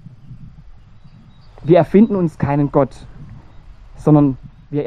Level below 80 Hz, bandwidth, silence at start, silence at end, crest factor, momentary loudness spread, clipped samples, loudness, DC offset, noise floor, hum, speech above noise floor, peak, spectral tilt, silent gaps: -42 dBFS; 9.2 kHz; 0.3 s; 0 s; 16 dB; 13 LU; under 0.1%; -15 LUFS; under 0.1%; -42 dBFS; none; 28 dB; 0 dBFS; -10 dB/octave; none